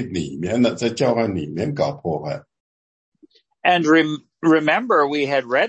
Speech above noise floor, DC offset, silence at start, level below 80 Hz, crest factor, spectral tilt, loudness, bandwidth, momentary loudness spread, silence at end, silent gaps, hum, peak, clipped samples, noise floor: 37 dB; under 0.1%; 0 s; -58 dBFS; 16 dB; -5.5 dB/octave; -19 LUFS; 8.6 kHz; 10 LU; 0 s; 2.60-3.12 s; none; -4 dBFS; under 0.1%; -56 dBFS